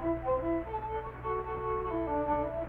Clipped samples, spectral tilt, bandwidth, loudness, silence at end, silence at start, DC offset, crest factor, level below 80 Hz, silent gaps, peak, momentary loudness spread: under 0.1%; -10 dB/octave; 4.2 kHz; -34 LUFS; 0 s; 0 s; under 0.1%; 14 dB; -46 dBFS; none; -20 dBFS; 5 LU